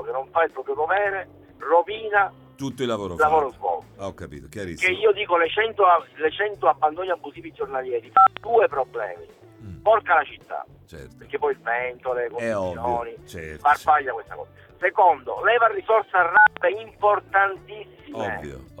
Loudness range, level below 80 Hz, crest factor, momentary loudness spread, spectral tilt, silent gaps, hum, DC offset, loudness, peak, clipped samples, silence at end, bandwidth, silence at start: 5 LU; -54 dBFS; 20 dB; 18 LU; -4.5 dB/octave; none; none; under 0.1%; -22 LUFS; -4 dBFS; under 0.1%; 0.15 s; 14.5 kHz; 0 s